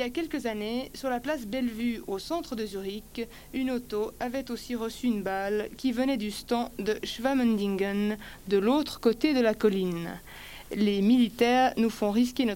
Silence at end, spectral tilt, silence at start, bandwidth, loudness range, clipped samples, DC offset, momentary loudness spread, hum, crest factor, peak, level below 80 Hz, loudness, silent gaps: 0 s; -5.5 dB/octave; 0 s; 17 kHz; 7 LU; under 0.1%; under 0.1%; 12 LU; none; 16 dB; -12 dBFS; -52 dBFS; -29 LUFS; none